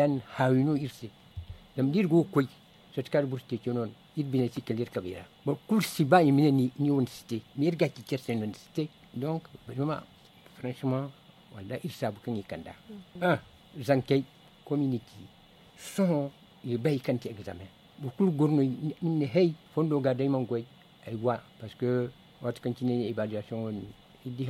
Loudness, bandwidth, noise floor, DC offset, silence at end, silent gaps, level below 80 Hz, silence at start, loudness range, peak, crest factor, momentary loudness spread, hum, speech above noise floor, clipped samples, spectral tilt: -30 LUFS; 16 kHz; -54 dBFS; under 0.1%; 0 s; none; -64 dBFS; 0 s; 8 LU; -8 dBFS; 22 dB; 17 LU; none; 25 dB; under 0.1%; -7.5 dB/octave